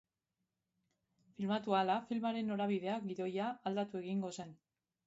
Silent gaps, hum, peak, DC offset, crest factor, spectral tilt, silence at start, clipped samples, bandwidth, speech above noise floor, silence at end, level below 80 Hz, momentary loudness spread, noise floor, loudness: none; none; -20 dBFS; under 0.1%; 20 dB; -5 dB/octave; 1.4 s; under 0.1%; 7.6 kHz; 51 dB; 0.55 s; -84 dBFS; 9 LU; -89 dBFS; -38 LUFS